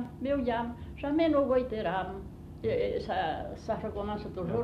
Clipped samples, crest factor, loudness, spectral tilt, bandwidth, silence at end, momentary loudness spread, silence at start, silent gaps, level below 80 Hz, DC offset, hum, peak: under 0.1%; 16 dB; -32 LUFS; -8 dB/octave; 12.5 kHz; 0 s; 11 LU; 0 s; none; -48 dBFS; under 0.1%; none; -16 dBFS